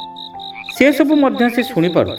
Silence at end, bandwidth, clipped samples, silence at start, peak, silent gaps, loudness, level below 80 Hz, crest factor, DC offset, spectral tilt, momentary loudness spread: 0 s; 19.5 kHz; under 0.1%; 0 s; 0 dBFS; none; -14 LUFS; -54 dBFS; 16 dB; under 0.1%; -6 dB/octave; 16 LU